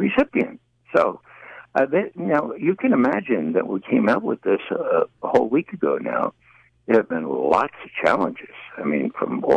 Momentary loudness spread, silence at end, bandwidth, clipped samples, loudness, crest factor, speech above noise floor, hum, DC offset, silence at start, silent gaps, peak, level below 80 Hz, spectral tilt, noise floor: 8 LU; 0 s; 9.2 kHz; under 0.1%; -22 LUFS; 16 dB; 23 dB; none; under 0.1%; 0 s; none; -6 dBFS; -60 dBFS; -7.5 dB/octave; -44 dBFS